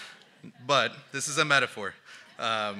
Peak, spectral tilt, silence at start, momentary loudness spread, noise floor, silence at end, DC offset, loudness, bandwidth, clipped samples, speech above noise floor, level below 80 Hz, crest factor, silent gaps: -6 dBFS; -2 dB/octave; 0 s; 23 LU; -51 dBFS; 0 s; under 0.1%; -27 LUFS; 15 kHz; under 0.1%; 23 dB; -82 dBFS; 24 dB; none